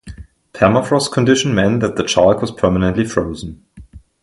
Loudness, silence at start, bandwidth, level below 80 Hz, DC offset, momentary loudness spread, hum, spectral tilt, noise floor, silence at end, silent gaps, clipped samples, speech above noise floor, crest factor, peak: -15 LUFS; 0.05 s; 11.5 kHz; -38 dBFS; under 0.1%; 8 LU; none; -5.5 dB/octave; -40 dBFS; 0.25 s; none; under 0.1%; 25 dB; 16 dB; 0 dBFS